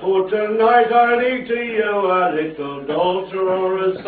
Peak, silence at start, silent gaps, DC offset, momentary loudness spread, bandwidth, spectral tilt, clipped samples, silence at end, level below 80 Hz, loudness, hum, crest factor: -2 dBFS; 0 s; none; under 0.1%; 8 LU; 4.7 kHz; -9 dB/octave; under 0.1%; 0 s; -58 dBFS; -18 LUFS; none; 16 dB